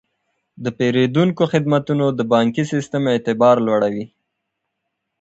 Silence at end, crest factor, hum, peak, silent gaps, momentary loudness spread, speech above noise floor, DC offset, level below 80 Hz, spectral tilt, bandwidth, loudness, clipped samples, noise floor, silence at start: 1.15 s; 16 dB; none; -2 dBFS; none; 9 LU; 60 dB; under 0.1%; -60 dBFS; -7 dB/octave; 8.2 kHz; -18 LUFS; under 0.1%; -77 dBFS; 0.6 s